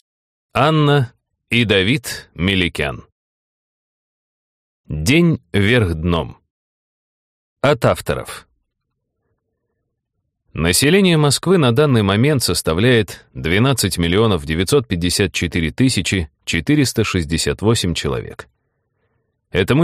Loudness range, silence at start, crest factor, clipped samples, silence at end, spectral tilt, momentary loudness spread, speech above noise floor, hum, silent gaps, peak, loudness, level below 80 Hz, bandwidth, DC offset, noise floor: 8 LU; 0.55 s; 16 dB; under 0.1%; 0 s; -5 dB/octave; 10 LU; 59 dB; none; 3.12-4.84 s, 6.50-7.56 s; -2 dBFS; -16 LUFS; -38 dBFS; 15.5 kHz; under 0.1%; -75 dBFS